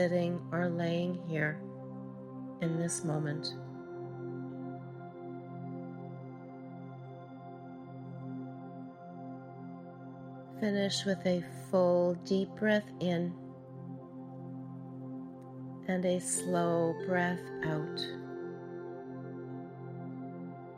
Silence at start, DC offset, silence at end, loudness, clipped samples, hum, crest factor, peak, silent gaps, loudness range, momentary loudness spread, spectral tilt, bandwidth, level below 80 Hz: 0 s; under 0.1%; 0 s; -36 LUFS; under 0.1%; none; 20 dB; -16 dBFS; none; 14 LU; 16 LU; -5.5 dB/octave; 13 kHz; -74 dBFS